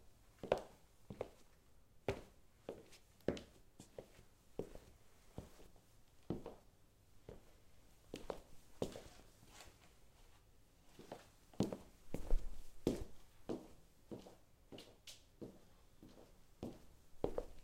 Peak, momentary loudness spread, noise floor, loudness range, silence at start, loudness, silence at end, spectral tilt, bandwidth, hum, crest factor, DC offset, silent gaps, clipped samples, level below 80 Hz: -20 dBFS; 24 LU; -68 dBFS; 9 LU; 0 s; -50 LUFS; 0 s; -6 dB/octave; 16 kHz; none; 28 dB; under 0.1%; none; under 0.1%; -54 dBFS